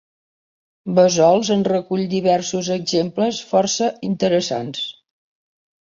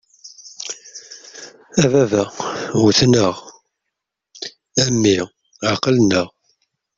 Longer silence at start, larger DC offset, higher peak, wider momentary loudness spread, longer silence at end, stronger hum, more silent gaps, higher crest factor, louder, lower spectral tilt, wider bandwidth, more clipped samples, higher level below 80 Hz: first, 0.85 s vs 0.25 s; neither; about the same, -2 dBFS vs -2 dBFS; second, 9 LU vs 21 LU; first, 0.95 s vs 0.7 s; neither; neither; about the same, 18 dB vs 18 dB; about the same, -19 LUFS vs -17 LUFS; about the same, -4.5 dB/octave vs -4.5 dB/octave; about the same, 7.6 kHz vs 8 kHz; neither; second, -60 dBFS vs -52 dBFS